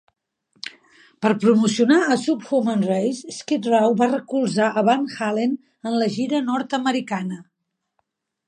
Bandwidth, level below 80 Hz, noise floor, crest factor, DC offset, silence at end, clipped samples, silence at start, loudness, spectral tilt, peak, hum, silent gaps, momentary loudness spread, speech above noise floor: 10.5 kHz; -74 dBFS; -78 dBFS; 18 dB; under 0.1%; 1.05 s; under 0.1%; 0.65 s; -21 LUFS; -5.5 dB/octave; -4 dBFS; none; none; 13 LU; 58 dB